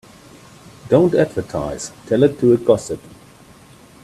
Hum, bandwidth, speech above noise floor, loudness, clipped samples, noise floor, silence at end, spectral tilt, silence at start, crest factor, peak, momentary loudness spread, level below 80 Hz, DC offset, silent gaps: none; 13.5 kHz; 29 dB; -17 LUFS; under 0.1%; -45 dBFS; 1.05 s; -6.5 dB/octave; 0.85 s; 18 dB; 0 dBFS; 15 LU; -50 dBFS; under 0.1%; none